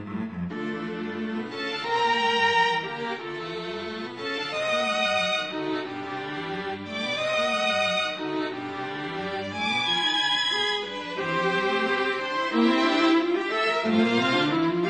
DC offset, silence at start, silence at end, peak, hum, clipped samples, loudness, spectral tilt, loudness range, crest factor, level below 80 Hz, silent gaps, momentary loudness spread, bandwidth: under 0.1%; 0 s; 0 s; -10 dBFS; none; under 0.1%; -25 LUFS; -4 dB/octave; 4 LU; 16 dB; -68 dBFS; none; 11 LU; 9.4 kHz